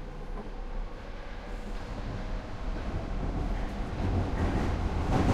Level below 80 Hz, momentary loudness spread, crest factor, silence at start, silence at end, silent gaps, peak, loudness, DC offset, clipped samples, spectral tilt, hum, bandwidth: -34 dBFS; 12 LU; 18 dB; 0 s; 0 s; none; -14 dBFS; -35 LUFS; under 0.1%; under 0.1%; -7.5 dB/octave; none; 10.5 kHz